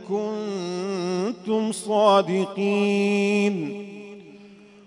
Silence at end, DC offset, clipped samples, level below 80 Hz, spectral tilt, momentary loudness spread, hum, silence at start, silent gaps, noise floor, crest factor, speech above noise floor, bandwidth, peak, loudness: 0.3 s; under 0.1%; under 0.1%; -76 dBFS; -5.5 dB/octave; 18 LU; none; 0 s; none; -48 dBFS; 18 dB; 25 dB; 11 kHz; -6 dBFS; -23 LUFS